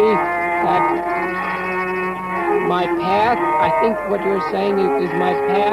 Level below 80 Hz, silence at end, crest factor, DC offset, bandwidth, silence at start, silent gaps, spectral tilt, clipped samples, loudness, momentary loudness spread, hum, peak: -50 dBFS; 0 s; 14 dB; under 0.1%; 14 kHz; 0 s; none; -6.5 dB/octave; under 0.1%; -18 LUFS; 5 LU; none; -4 dBFS